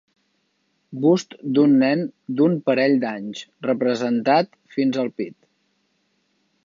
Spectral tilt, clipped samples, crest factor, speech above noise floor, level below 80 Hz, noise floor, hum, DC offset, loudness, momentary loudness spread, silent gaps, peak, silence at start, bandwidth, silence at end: -6.5 dB/octave; under 0.1%; 16 dB; 49 dB; -74 dBFS; -69 dBFS; none; under 0.1%; -21 LUFS; 13 LU; none; -4 dBFS; 0.9 s; 7.4 kHz; 1.35 s